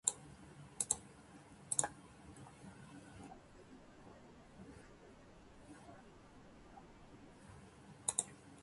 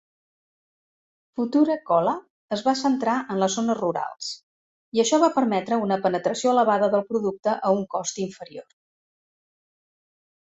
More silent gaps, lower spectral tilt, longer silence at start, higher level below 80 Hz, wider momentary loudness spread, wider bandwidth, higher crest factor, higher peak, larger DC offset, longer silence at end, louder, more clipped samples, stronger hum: second, none vs 2.30-2.48 s, 4.43-4.92 s; second, -2 dB/octave vs -4.5 dB/octave; second, 0.05 s vs 1.35 s; about the same, -70 dBFS vs -70 dBFS; first, 22 LU vs 13 LU; first, 11.5 kHz vs 8.2 kHz; first, 36 dB vs 18 dB; second, -12 dBFS vs -6 dBFS; neither; second, 0 s vs 1.8 s; second, -41 LUFS vs -23 LUFS; neither; neither